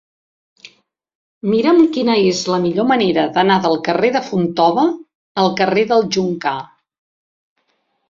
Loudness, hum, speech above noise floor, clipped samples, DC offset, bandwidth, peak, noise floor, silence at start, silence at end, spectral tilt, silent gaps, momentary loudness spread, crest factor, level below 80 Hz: -15 LUFS; none; 52 dB; under 0.1%; under 0.1%; 7.6 kHz; -2 dBFS; -66 dBFS; 1.45 s; 1.45 s; -5.5 dB/octave; 5.15-5.35 s; 8 LU; 16 dB; -58 dBFS